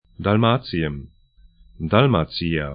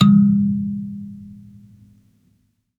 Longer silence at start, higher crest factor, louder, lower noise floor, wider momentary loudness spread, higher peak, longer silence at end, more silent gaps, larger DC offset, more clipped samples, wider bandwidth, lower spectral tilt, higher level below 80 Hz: first, 0.2 s vs 0 s; about the same, 20 dB vs 18 dB; about the same, -20 LUFS vs -18 LUFS; second, -52 dBFS vs -64 dBFS; second, 12 LU vs 25 LU; about the same, 0 dBFS vs -2 dBFS; second, 0 s vs 1.45 s; neither; neither; neither; first, 5.2 kHz vs 4.3 kHz; first, -11.5 dB/octave vs -8 dB/octave; first, -42 dBFS vs -58 dBFS